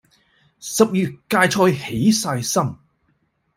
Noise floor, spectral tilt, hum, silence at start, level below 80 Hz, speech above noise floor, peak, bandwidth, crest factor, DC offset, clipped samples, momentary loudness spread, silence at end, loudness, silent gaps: -66 dBFS; -4.5 dB/octave; none; 0.6 s; -56 dBFS; 48 dB; -2 dBFS; 16 kHz; 18 dB; under 0.1%; under 0.1%; 9 LU; 0.8 s; -19 LUFS; none